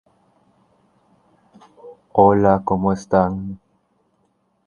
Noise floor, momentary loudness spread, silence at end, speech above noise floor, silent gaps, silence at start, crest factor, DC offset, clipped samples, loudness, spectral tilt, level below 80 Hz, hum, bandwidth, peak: -65 dBFS; 17 LU; 1.1 s; 49 dB; none; 1.85 s; 22 dB; under 0.1%; under 0.1%; -17 LUFS; -8.5 dB/octave; -46 dBFS; none; 10 kHz; 0 dBFS